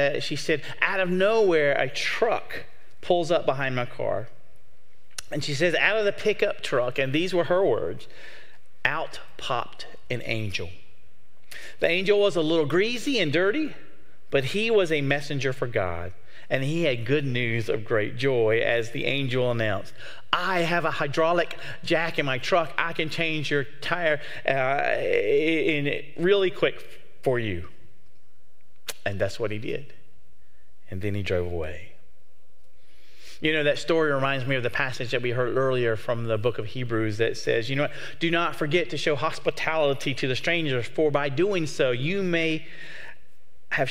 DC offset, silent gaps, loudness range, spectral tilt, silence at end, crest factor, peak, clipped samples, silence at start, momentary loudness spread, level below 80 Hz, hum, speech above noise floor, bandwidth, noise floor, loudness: 3%; none; 7 LU; -5.5 dB/octave; 0 s; 22 dB; -4 dBFS; under 0.1%; 0 s; 12 LU; -60 dBFS; none; 40 dB; 16 kHz; -66 dBFS; -25 LUFS